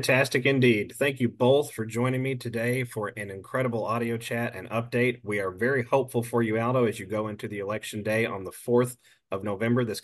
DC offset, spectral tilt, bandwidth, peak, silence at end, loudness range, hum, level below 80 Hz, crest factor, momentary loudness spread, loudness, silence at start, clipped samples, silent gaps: under 0.1%; -6 dB/octave; 12.5 kHz; -8 dBFS; 0.05 s; 3 LU; none; -66 dBFS; 18 dB; 10 LU; -27 LUFS; 0 s; under 0.1%; none